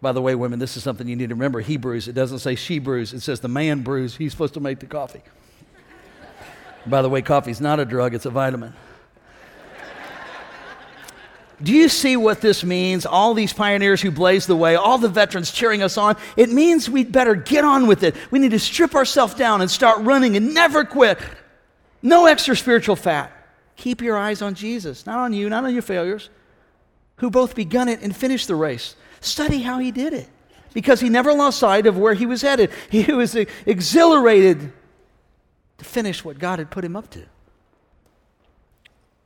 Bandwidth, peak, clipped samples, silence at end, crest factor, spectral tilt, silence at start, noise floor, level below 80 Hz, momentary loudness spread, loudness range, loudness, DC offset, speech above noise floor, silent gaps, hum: 18 kHz; 0 dBFS; under 0.1%; 2.05 s; 18 dB; -5 dB/octave; 0 s; -61 dBFS; -50 dBFS; 14 LU; 11 LU; -18 LUFS; under 0.1%; 43 dB; none; none